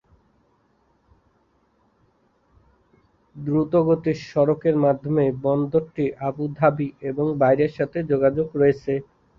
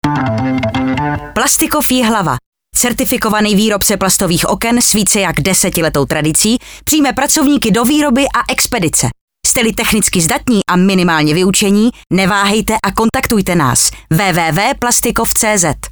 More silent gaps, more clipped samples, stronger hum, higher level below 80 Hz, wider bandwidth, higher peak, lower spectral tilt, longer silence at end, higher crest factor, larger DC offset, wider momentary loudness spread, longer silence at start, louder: second, none vs 2.46-2.52 s, 9.21-9.28 s; neither; neither; second, -56 dBFS vs -34 dBFS; second, 7 kHz vs over 20 kHz; second, -4 dBFS vs 0 dBFS; first, -9.5 dB/octave vs -3.5 dB/octave; first, 0.35 s vs 0 s; first, 20 dB vs 12 dB; neither; first, 8 LU vs 5 LU; first, 3.35 s vs 0.05 s; second, -22 LUFS vs -12 LUFS